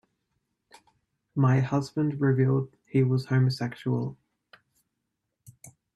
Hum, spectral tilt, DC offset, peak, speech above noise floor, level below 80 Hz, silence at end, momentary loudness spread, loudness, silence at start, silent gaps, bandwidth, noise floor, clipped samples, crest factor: none; -8 dB/octave; under 0.1%; -10 dBFS; 57 dB; -66 dBFS; 0.25 s; 8 LU; -26 LUFS; 1.35 s; none; 10.5 kHz; -82 dBFS; under 0.1%; 18 dB